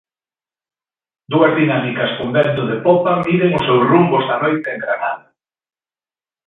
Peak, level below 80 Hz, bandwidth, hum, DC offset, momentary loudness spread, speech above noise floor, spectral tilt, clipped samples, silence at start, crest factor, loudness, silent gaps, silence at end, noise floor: 0 dBFS; -56 dBFS; 4.2 kHz; none; under 0.1%; 8 LU; over 75 dB; -9 dB/octave; under 0.1%; 1.3 s; 16 dB; -16 LUFS; none; 1.3 s; under -90 dBFS